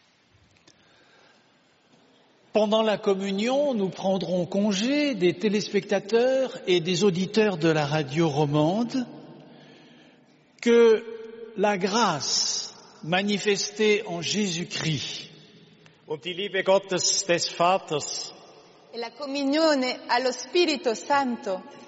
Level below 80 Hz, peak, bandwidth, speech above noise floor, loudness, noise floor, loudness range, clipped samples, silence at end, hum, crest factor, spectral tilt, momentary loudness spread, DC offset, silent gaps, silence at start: -70 dBFS; -8 dBFS; 8 kHz; 37 dB; -24 LUFS; -62 dBFS; 3 LU; under 0.1%; 0 s; none; 16 dB; -3.5 dB/octave; 11 LU; under 0.1%; none; 2.55 s